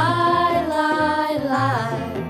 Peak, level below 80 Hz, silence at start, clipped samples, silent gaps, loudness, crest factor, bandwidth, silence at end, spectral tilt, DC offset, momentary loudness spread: -8 dBFS; -54 dBFS; 0 s; under 0.1%; none; -20 LUFS; 12 dB; over 20 kHz; 0 s; -6 dB/octave; under 0.1%; 4 LU